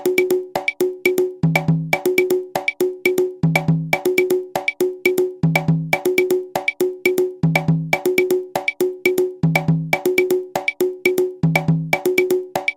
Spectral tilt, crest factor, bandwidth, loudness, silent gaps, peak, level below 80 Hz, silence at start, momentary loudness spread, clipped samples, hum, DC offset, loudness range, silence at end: -6 dB/octave; 18 dB; 17 kHz; -19 LUFS; none; 0 dBFS; -52 dBFS; 0 s; 3 LU; under 0.1%; none; under 0.1%; 1 LU; 0.05 s